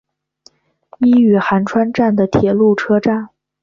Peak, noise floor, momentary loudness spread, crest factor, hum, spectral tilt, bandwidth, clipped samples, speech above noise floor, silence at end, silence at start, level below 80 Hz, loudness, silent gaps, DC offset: -2 dBFS; -51 dBFS; 7 LU; 12 dB; none; -8 dB/octave; 7.2 kHz; under 0.1%; 39 dB; 0.35 s; 1 s; -48 dBFS; -14 LUFS; none; under 0.1%